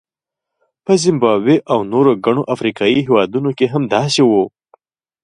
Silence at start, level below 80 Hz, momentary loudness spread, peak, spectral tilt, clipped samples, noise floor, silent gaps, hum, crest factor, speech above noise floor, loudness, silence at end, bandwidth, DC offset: 0.9 s; -58 dBFS; 5 LU; 0 dBFS; -5.5 dB/octave; under 0.1%; -83 dBFS; none; none; 14 dB; 70 dB; -15 LUFS; 0.75 s; 11.5 kHz; under 0.1%